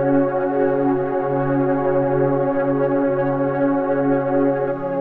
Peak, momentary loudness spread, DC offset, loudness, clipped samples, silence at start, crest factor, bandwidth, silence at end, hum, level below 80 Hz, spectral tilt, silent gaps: -8 dBFS; 2 LU; 0.9%; -19 LUFS; under 0.1%; 0 s; 12 dB; 3.8 kHz; 0 s; none; -50 dBFS; -11.5 dB/octave; none